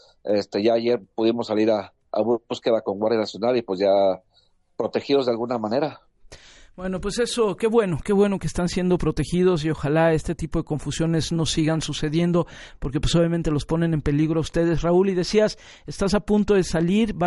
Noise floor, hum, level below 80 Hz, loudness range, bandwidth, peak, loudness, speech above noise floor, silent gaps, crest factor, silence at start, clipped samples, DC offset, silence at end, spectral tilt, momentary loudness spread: -62 dBFS; none; -40 dBFS; 3 LU; 11.5 kHz; -6 dBFS; -22 LUFS; 40 dB; none; 16 dB; 0.25 s; under 0.1%; under 0.1%; 0 s; -6 dB/octave; 7 LU